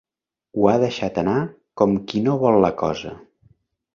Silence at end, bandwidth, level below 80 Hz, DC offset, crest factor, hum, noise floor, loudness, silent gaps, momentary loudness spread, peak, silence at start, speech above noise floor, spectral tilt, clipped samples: 0.75 s; 7.2 kHz; -52 dBFS; under 0.1%; 20 dB; none; -82 dBFS; -20 LUFS; none; 14 LU; -2 dBFS; 0.55 s; 62 dB; -7.5 dB/octave; under 0.1%